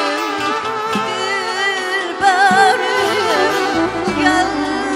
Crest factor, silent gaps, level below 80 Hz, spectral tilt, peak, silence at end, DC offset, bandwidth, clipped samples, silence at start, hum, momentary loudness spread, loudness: 14 dB; none; -48 dBFS; -3 dB/octave; -2 dBFS; 0 s; under 0.1%; 16 kHz; under 0.1%; 0 s; none; 7 LU; -15 LUFS